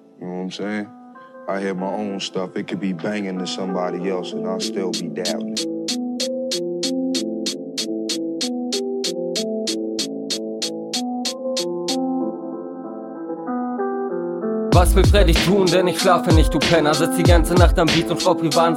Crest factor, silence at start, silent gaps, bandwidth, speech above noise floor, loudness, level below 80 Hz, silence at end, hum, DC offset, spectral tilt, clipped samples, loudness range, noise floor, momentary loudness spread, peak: 20 dB; 0.2 s; none; 16.5 kHz; 23 dB; -21 LUFS; -28 dBFS; 0 s; none; under 0.1%; -5 dB/octave; under 0.1%; 9 LU; -41 dBFS; 12 LU; 0 dBFS